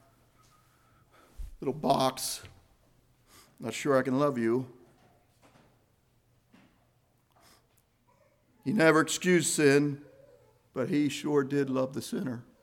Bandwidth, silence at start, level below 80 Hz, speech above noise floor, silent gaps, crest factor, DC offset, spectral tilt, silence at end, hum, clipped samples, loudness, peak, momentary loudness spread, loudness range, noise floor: 17.5 kHz; 1.4 s; -58 dBFS; 41 dB; none; 22 dB; under 0.1%; -4.5 dB/octave; 0.2 s; none; under 0.1%; -28 LUFS; -8 dBFS; 16 LU; 8 LU; -69 dBFS